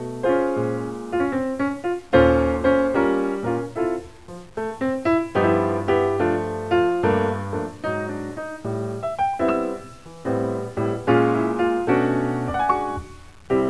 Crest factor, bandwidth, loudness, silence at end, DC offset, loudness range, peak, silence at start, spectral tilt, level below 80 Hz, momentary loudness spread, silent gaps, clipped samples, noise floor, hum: 18 dB; 11 kHz; -22 LUFS; 0 s; 0.4%; 4 LU; -4 dBFS; 0 s; -7.5 dB/octave; -44 dBFS; 11 LU; none; under 0.1%; -41 dBFS; none